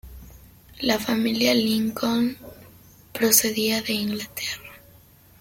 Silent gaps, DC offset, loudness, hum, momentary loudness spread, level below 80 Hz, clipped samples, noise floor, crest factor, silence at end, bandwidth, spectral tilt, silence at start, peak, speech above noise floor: none; under 0.1%; -22 LUFS; none; 13 LU; -52 dBFS; under 0.1%; -52 dBFS; 22 dB; 0.65 s; 16.5 kHz; -2.5 dB/octave; 0.05 s; -2 dBFS; 30 dB